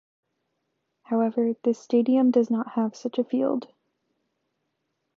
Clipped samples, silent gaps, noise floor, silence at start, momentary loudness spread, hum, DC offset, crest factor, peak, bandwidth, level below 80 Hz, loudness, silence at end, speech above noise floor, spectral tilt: under 0.1%; none; -78 dBFS; 1.1 s; 8 LU; none; under 0.1%; 16 dB; -10 dBFS; 7.2 kHz; -82 dBFS; -25 LUFS; 1.5 s; 54 dB; -7.5 dB/octave